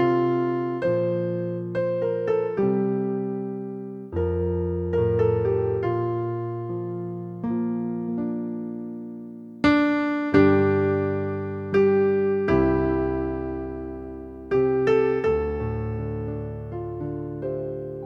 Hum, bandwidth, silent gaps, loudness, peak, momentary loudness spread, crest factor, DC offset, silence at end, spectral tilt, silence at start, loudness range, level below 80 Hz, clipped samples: none; 7 kHz; none; -25 LUFS; -4 dBFS; 13 LU; 20 dB; under 0.1%; 0 s; -9 dB/octave; 0 s; 6 LU; -44 dBFS; under 0.1%